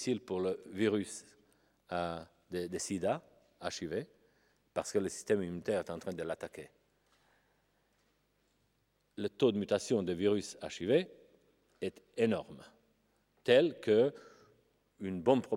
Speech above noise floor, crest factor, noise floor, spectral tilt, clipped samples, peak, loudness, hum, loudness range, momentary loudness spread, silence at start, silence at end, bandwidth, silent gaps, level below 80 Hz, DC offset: 43 dB; 22 dB; -77 dBFS; -5 dB/octave; under 0.1%; -14 dBFS; -35 LUFS; 50 Hz at -75 dBFS; 7 LU; 15 LU; 0 s; 0 s; 15.5 kHz; none; -76 dBFS; under 0.1%